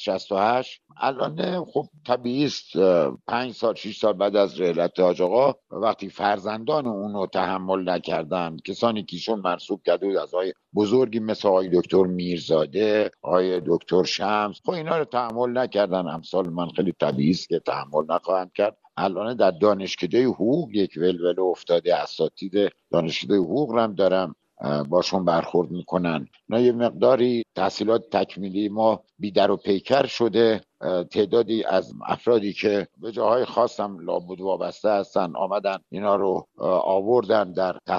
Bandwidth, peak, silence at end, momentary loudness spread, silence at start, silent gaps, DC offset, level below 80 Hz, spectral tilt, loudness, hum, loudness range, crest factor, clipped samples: 7.4 kHz; -4 dBFS; 0 s; 7 LU; 0 s; none; under 0.1%; -66 dBFS; -6 dB/octave; -23 LUFS; none; 3 LU; 18 dB; under 0.1%